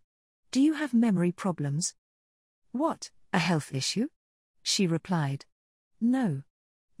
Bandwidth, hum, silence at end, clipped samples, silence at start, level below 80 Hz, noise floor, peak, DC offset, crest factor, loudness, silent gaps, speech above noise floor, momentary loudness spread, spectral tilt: 15 kHz; none; 0.6 s; under 0.1%; 0.55 s; -72 dBFS; under -90 dBFS; -12 dBFS; under 0.1%; 18 dB; -29 LUFS; 1.98-2.62 s, 4.16-4.54 s, 5.52-5.91 s; over 63 dB; 10 LU; -5 dB/octave